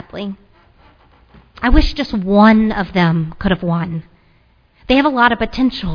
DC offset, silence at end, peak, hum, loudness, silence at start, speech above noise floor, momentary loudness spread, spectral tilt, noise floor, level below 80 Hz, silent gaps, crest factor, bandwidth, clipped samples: under 0.1%; 0 s; 0 dBFS; none; -15 LUFS; 0.15 s; 39 dB; 17 LU; -7.5 dB/octave; -53 dBFS; -26 dBFS; none; 16 dB; 5.4 kHz; under 0.1%